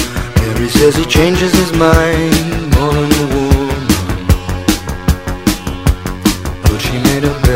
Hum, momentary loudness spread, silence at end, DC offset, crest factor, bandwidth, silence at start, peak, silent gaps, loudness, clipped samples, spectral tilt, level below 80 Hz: none; 6 LU; 0 s; 1%; 12 dB; 16.5 kHz; 0 s; 0 dBFS; none; -13 LUFS; 0.2%; -5 dB/octave; -18 dBFS